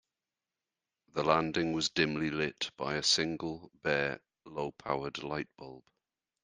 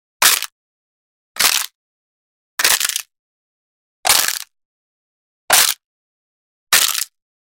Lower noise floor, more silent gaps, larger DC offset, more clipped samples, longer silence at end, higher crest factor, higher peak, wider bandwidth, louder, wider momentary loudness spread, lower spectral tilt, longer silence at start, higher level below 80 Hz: about the same, under -90 dBFS vs under -90 dBFS; second, none vs 0.52-1.35 s, 1.75-2.58 s, 3.19-4.03 s, 4.65-5.48 s, 5.86-6.67 s; neither; neither; first, 0.65 s vs 0.45 s; about the same, 24 dB vs 20 dB; second, -12 dBFS vs 0 dBFS; second, 10 kHz vs 17 kHz; second, -33 LUFS vs -15 LUFS; about the same, 14 LU vs 15 LU; first, -3.5 dB/octave vs 2.5 dB/octave; first, 1.15 s vs 0.2 s; second, -64 dBFS vs -58 dBFS